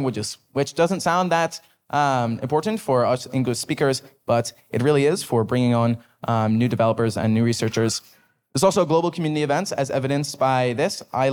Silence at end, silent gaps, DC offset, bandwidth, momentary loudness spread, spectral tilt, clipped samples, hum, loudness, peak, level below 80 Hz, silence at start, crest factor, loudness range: 0 s; none; under 0.1%; 19.5 kHz; 6 LU; -5.5 dB/octave; under 0.1%; none; -22 LUFS; -6 dBFS; -64 dBFS; 0 s; 16 dB; 1 LU